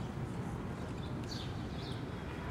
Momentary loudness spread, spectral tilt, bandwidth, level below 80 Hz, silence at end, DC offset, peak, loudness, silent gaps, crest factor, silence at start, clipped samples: 1 LU; -6.5 dB/octave; 15.5 kHz; -50 dBFS; 0 s; under 0.1%; -28 dBFS; -42 LUFS; none; 12 dB; 0 s; under 0.1%